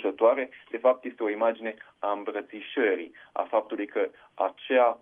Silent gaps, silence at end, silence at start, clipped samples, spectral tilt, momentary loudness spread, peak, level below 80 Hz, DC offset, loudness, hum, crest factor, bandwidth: none; 0.05 s; 0 s; under 0.1%; -6.5 dB/octave; 12 LU; -8 dBFS; -80 dBFS; under 0.1%; -28 LUFS; none; 18 dB; 3.7 kHz